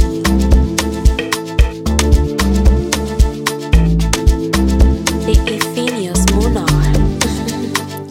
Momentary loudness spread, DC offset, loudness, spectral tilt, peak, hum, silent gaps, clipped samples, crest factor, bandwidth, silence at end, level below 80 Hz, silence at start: 5 LU; under 0.1%; -15 LUFS; -5 dB/octave; 0 dBFS; none; none; under 0.1%; 12 dB; 16.5 kHz; 0 s; -16 dBFS; 0 s